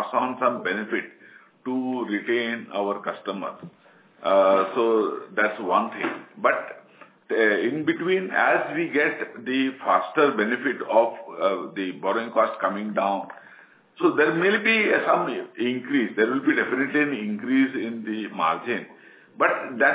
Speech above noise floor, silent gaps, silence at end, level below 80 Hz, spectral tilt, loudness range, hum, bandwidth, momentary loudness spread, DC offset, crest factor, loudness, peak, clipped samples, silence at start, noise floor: 28 dB; none; 0 s; -84 dBFS; -8.5 dB/octave; 4 LU; none; 4 kHz; 10 LU; under 0.1%; 18 dB; -24 LUFS; -6 dBFS; under 0.1%; 0 s; -52 dBFS